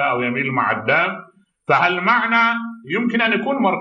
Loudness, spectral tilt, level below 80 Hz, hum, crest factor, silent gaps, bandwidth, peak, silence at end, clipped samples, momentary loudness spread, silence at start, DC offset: -18 LUFS; -6.5 dB/octave; -70 dBFS; none; 16 dB; none; 7.2 kHz; -2 dBFS; 0 s; under 0.1%; 9 LU; 0 s; under 0.1%